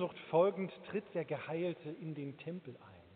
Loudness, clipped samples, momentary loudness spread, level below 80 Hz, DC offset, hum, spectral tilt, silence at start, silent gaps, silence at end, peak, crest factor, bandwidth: -38 LUFS; under 0.1%; 15 LU; -82 dBFS; under 0.1%; none; -6 dB/octave; 0 s; none; 0 s; -20 dBFS; 20 dB; 4.5 kHz